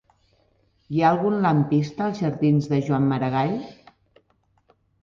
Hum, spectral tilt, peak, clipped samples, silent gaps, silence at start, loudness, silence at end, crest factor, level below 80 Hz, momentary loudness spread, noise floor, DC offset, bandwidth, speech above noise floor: none; -8.5 dB/octave; -6 dBFS; under 0.1%; none; 0.9 s; -22 LUFS; 1.3 s; 16 dB; -60 dBFS; 7 LU; -65 dBFS; under 0.1%; 7.2 kHz; 44 dB